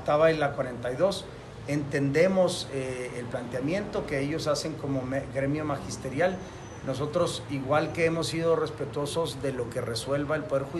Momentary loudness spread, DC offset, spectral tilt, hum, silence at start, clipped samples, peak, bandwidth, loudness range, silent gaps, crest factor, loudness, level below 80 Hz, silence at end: 10 LU; under 0.1%; -5.5 dB/octave; none; 0 s; under 0.1%; -10 dBFS; 12.5 kHz; 2 LU; none; 18 dB; -29 LUFS; -52 dBFS; 0 s